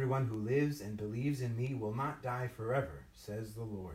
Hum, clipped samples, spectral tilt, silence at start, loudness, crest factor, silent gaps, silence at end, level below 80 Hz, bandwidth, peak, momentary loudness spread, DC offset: none; under 0.1%; -7.5 dB/octave; 0 s; -38 LUFS; 16 dB; none; 0 s; -62 dBFS; 16 kHz; -22 dBFS; 10 LU; under 0.1%